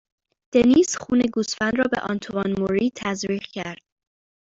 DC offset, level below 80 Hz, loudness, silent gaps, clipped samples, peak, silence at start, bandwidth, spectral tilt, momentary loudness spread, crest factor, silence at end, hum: under 0.1%; -54 dBFS; -22 LUFS; none; under 0.1%; -6 dBFS; 0.55 s; 7.8 kHz; -4.5 dB/octave; 13 LU; 18 dB; 0.8 s; none